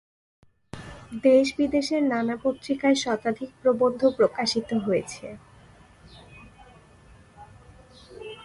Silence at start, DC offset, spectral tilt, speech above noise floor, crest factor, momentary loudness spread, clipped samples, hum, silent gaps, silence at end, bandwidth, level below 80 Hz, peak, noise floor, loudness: 0.75 s; under 0.1%; -4.5 dB/octave; 29 dB; 18 dB; 22 LU; under 0.1%; none; none; 0 s; 11.5 kHz; -58 dBFS; -8 dBFS; -53 dBFS; -24 LUFS